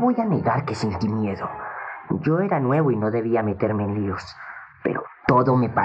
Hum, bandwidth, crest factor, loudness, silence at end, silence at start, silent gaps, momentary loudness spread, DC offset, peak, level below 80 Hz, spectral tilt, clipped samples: none; 8.8 kHz; 20 dB; -23 LUFS; 0 s; 0 s; none; 12 LU; under 0.1%; -4 dBFS; -56 dBFS; -8.5 dB/octave; under 0.1%